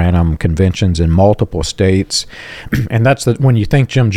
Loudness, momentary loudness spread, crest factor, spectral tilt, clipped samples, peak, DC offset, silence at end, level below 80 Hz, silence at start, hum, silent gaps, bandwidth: -13 LUFS; 7 LU; 12 dB; -6 dB/octave; under 0.1%; 0 dBFS; under 0.1%; 0 s; -30 dBFS; 0 s; none; none; 14 kHz